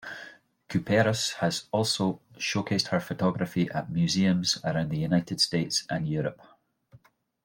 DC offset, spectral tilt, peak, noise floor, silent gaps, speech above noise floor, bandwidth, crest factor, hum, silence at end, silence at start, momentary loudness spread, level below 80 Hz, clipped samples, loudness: under 0.1%; -4.5 dB/octave; -10 dBFS; -59 dBFS; none; 32 dB; 16.5 kHz; 20 dB; none; 1.1 s; 0 s; 8 LU; -62 dBFS; under 0.1%; -27 LUFS